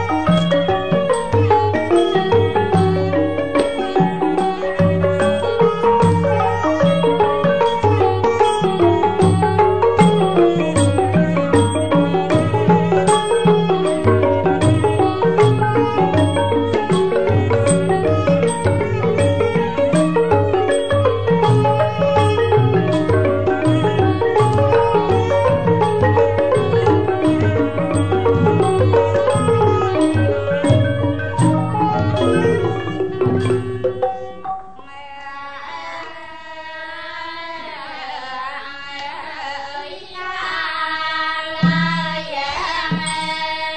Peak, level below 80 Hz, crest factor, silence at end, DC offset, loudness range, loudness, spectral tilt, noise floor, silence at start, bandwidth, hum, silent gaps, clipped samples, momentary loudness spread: -2 dBFS; -44 dBFS; 14 dB; 0 s; 2%; 11 LU; -16 LUFS; -6.5 dB/octave; -37 dBFS; 0 s; 9.4 kHz; none; none; under 0.1%; 13 LU